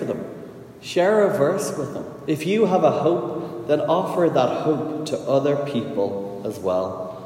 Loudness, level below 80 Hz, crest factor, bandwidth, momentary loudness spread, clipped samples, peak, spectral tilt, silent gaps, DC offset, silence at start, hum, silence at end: -22 LUFS; -64 dBFS; 16 dB; 16 kHz; 12 LU; under 0.1%; -4 dBFS; -6 dB/octave; none; under 0.1%; 0 s; none; 0 s